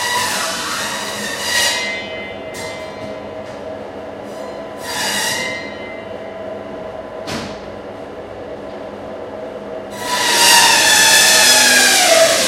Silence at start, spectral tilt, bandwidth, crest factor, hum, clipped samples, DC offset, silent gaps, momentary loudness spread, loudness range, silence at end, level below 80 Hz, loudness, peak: 0 s; 0 dB/octave; over 20 kHz; 18 dB; none; under 0.1%; under 0.1%; none; 22 LU; 18 LU; 0 s; -52 dBFS; -12 LUFS; 0 dBFS